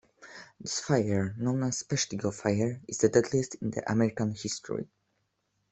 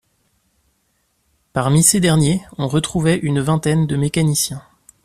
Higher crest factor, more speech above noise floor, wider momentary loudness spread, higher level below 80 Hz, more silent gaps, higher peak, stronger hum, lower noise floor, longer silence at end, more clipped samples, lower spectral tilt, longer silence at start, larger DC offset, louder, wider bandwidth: about the same, 22 dB vs 18 dB; about the same, 48 dB vs 49 dB; first, 13 LU vs 9 LU; second, -64 dBFS vs -46 dBFS; neither; second, -8 dBFS vs 0 dBFS; neither; first, -77 dBFS vs -65 dBFS; first, 0.85 s vs 0.45 s; neither; about the same, -5 dB/octave vs -5 dB/octave; second, 0.2 s vs 1.55 s; neither; second, -30 LUFS vs -17 LUFS; second, 8.4 kHz vs 14 kHz